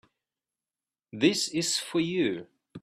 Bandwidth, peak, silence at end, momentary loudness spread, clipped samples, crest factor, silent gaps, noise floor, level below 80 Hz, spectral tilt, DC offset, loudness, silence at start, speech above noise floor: 14.5 kHz; -8 dBFS; 0.05 s; 10 LU; under 0.1%; 22 dB; none; under -90 dBFS; -72 dBFS; -3.5 dB/octave; under 0.1%; -27 LUFS; 1.15 s; over 62 dB